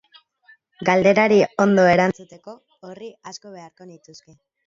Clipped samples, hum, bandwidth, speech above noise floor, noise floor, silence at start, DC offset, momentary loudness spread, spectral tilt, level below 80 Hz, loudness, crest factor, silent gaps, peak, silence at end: under 0.1%; none; 7.6 kHz; 36 dB; -56 dBFS; 0.8 s; under 0.1%; 23 LU; -6 dB/octave; -60 dBFS; -17 LUFS; 18 dB; none; -2 dBFS; 0.75 s